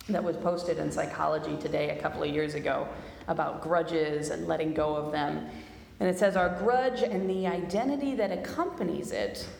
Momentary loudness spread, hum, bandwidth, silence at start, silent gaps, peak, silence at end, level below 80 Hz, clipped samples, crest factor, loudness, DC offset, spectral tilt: 7 LU; none; 19.5 kHz; 0 s; none; -14 dBFS; 0 s; -56 dBFS; under 0.1%; 16 dB; -30 LUFS; under 0.1%; -6 dB/octave